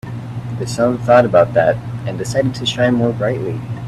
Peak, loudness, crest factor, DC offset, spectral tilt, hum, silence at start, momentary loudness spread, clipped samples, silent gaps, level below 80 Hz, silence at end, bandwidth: 0 dBFS; -16 LUFS; 16 dB; under 0.1%; -6 dB/octave; none; 0.05 s; 13 LU; under 0.1%; none; -44 dBFS; 0 s; 12.5 kHz